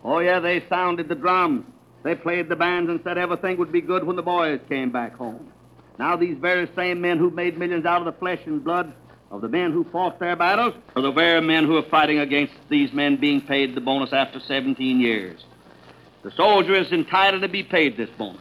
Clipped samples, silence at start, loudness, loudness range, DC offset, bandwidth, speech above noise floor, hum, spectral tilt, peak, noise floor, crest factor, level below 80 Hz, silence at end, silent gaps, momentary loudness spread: under 0.1%; 0.05 s; -21 LUFS; 5 LU; under 0.1%; 12.5 kHz; 27 dB; none; -6.5 dB/octave; -4 dBFS; -49 dBFS; 18 dB; -64 dBFS; 0.05 s; none; 9 LU